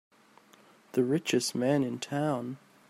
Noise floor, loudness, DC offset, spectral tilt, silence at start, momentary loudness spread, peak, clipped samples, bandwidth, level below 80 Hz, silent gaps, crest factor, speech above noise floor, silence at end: -60 dBFS; -30 LUFS; under 0.1%; -5 dB/octave; 0.95 s; 7 LU; -14 dBFS; under 0.1%; 16 kHz; -76 dBFS; none; 18 dB; 30 dB; 0.3 s